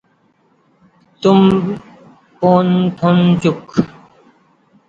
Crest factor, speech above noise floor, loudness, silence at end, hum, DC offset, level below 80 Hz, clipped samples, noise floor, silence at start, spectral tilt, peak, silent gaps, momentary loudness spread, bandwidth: 16 dB; 45 dB; -14 LUFS; 1 s; none; under 0.1%; -50 dBFS; under 0.1%; -57 dBFS; 1.2 s; -8 dB/octave; 0 dBFS; none; 10 LU; 7.8 kHz